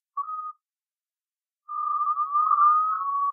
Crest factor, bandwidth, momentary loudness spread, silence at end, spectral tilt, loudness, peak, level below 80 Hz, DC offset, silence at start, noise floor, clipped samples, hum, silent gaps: 16 dB; 1.6 kHz; 16 LU; 0 s; 17 dB/octave; -23 LUFS; -10 dBFS; under -90 dBFS; under 0.1%; 0.15 s; under -90 dBFS; under 0.1%; none; none